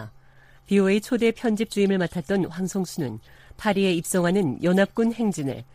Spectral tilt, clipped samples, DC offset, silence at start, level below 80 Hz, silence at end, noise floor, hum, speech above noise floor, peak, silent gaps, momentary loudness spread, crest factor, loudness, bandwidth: -6 dB/octave; under 0.1%; under 0.1%; 0 s; -56 dBFS; 0.1 s; -52 dBFS; none; 29 dB; -8 dBFS; none; 8 LU; 16 dB; -24 LUFS; 15.5 kHz